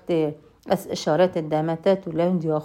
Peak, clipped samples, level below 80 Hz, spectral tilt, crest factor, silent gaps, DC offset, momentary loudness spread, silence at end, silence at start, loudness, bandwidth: -6 dBFS; under 0.1%; -62 dBFS; -6.5 dB/octave; 16 dB; none; under 0.1%; 6 LU; 0 s; 0.1 s; -23 LUFS; 16 kHz